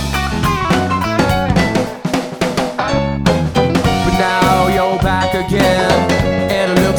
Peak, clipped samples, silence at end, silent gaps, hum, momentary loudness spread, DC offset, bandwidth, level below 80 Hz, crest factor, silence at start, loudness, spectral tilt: 0 dBFS; under 0.1%; 0 s; none; none; 5 LU; under 0.1%; over 20 kHz; -28 dBFS; 14 dB; 0 s; -14 LUFS; -5.5 dB/octave